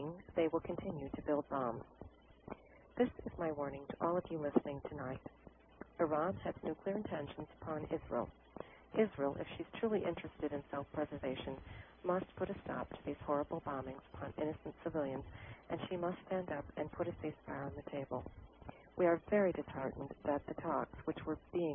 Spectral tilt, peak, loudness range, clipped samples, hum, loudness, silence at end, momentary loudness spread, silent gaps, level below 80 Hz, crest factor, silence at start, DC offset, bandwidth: -4 dB/octave; -16 dBFS; 4 LU; under 0.1%; none; -41 LUFS; 0 s; 16 LU; none; -62 dBFS; 24 dB; 0 s; under 0.1%; 3.7 kHz